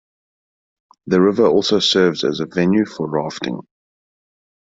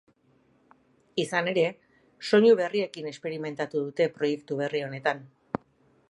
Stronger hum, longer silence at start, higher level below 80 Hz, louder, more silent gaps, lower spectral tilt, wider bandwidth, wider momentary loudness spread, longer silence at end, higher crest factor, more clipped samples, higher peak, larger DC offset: neither; about the same, 1.05 s vs 1.15 s; first, -58 dBFS vs -74 dBFS; first, -17 LUFS vs -27 LUFS; neither; about the same, -5 dB/octave vs -5.5 dB/octave; second, 7.8 kHz vs 11.5 kHz; second, 11 LU vs 16 LU; first, 1.05 s vs 0.85 s; about the same, 16 dB vs 20 dB; neither; first, -2 dBFS vs -8 dBFS; neither